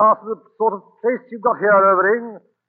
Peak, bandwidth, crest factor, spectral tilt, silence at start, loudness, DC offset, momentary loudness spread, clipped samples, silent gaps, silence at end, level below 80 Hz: -4 dBFS; 3 kHz; 14 dB; -11.5 dB/octave; 0 s; -18 LUFS; under 0.1%; 11 LU; under 0.1%; none; 0.3 s; -82 dBFS